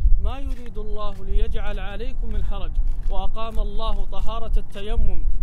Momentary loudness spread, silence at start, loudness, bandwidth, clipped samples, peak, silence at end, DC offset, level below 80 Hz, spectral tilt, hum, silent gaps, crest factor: 6 LU; 0 s; -30 LUFS; 4.2 kHz; under 0.1%; -2 dBFS; 0 s; under 0.1%; -20 dBFS; -7 dB/octave; none; none; 14 dB